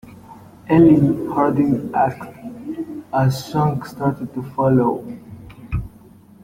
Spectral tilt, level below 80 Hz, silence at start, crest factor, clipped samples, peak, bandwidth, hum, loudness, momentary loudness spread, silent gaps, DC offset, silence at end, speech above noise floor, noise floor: -8.5 dB/octave; -44 dBFS; 0.05 s; 16 dB; under 0.1%; -2 dBFS; 16 kHz; none; -19 LUFS; 21 LU; none; under 0.1%; 0.55 s; 28 dB; -46 dBFS